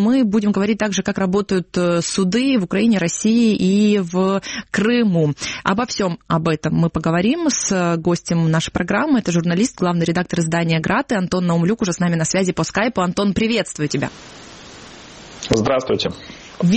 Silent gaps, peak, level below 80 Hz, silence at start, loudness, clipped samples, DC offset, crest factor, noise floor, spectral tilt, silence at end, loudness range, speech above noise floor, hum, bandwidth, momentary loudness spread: none; 0 dBFS; -46 dBFS; 0 s; -18 LUFS; under 0.1%; under 0.1%; 18 dB; -39 dBFS; -5 dB/octave; 0 s; 4 LU; 21 dB; none; 8.8 kHz; 7 LU